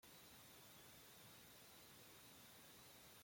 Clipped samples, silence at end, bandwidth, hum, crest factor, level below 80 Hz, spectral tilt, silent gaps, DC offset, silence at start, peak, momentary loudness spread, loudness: under 0.1%; 0 s; 16.5 kHz; none; 14 dB; -84 dBFS; -2 dB/octave; none; under 0.1%; 0 s; -52 dBFS; 0 LU; -62 LUFS